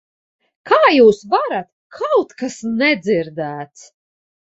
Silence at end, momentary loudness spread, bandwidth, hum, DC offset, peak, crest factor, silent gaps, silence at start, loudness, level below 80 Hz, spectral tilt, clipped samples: 0.75 s; 15 LU; 8 kHz; none; under 0.1%; -2 dBFS; 16 dB; 1.72-1.90 s; 0.65 s; -16 LUFS; -60 dBFS; -5 dB/octave; under 0.1%